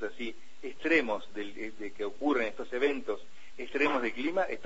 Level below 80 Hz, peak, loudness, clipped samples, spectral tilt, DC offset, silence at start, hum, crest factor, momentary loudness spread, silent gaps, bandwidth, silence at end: -64 dBFS; -14 dBFS; -32 LUFS; under 0.1%; -4.5 dB/octave; 1%; 0 s; none; 18 dB; 14 LU; none; 8 kHz; 0.05 s